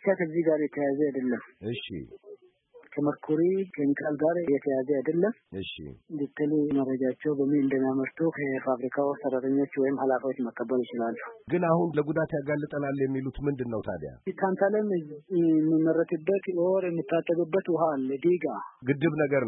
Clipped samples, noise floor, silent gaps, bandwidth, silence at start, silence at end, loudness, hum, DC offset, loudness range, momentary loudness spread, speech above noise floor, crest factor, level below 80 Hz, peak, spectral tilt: under 0.1%; -57 dBFS; none; 4 kHz; 0 s; 0 s; -28 LUFS; none; under 0.1%; 3 LU; 10 LU; 29 dB; 16 dB; -60 dBFS; -12 dBFS; -11.5 dB/octave